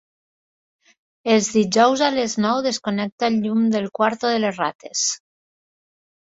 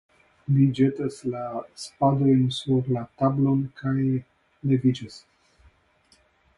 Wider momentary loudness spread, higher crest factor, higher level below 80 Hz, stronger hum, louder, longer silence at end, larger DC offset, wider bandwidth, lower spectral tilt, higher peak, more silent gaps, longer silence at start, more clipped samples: second, 8 LU vs 13 LU; about the same, 20 dB vs 18 dB; second, -64 dBFS vs -58 dBFS; neither; first, -20 LUFS vs -24 LUFS; second, 1.15 s vs 1.4 s; neither; second, 8 kHz vs 11.5 kHz; second, -3.5 dB/octave vs -8 dB/octave; first, -2 dBFS vs -8 dBFS; first, 3.12-3.18 s, 4.75-4.79 s vs none; first, 1.25 s vs 0.5 s; neither